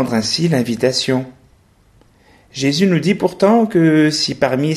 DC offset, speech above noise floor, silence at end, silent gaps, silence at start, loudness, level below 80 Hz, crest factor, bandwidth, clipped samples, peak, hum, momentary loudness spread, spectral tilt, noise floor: under 0.1%; 37 dB; 0 s; none; 0 s; -15 LUFS; -54 dBFS; 14 dB; 13.5 kHz; under 0.1%; -2 dBFS; none; 7 LU; -5 dB/octave; -52 dBFS